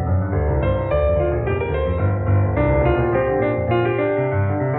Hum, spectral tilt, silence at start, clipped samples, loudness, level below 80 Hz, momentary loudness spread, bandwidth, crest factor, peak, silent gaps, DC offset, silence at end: none; -8 dB/octave; 0 s; under 0.1%; -19 LUFS; -28 dBFS; 3 LU; 4 kHz; 12 dB; -6 dBFS; none; under 0.1%; 0 s